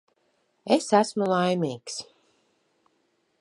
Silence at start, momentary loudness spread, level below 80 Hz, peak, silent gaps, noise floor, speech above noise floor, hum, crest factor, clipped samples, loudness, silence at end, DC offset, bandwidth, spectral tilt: 0.65 s; 15 LU; -76 dBFS; -6 dBFS; none; -71 dBFS; 47 dB; none; 22 dB; under 0.1%; -25 LUFS; 1.4 s; under 0.1%; 11.5 kHz; -5 dB/octave